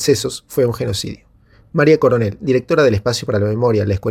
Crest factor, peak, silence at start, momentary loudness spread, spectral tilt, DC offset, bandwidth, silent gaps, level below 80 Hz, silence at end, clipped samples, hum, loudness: 16 dB; -2 dBFS; 0 s; 10 LU; -5.5 dB/octave; under 0.1%; 16 kHz; none; -44 dBFS; 0 s; under 0.1%; none; -16 LUFS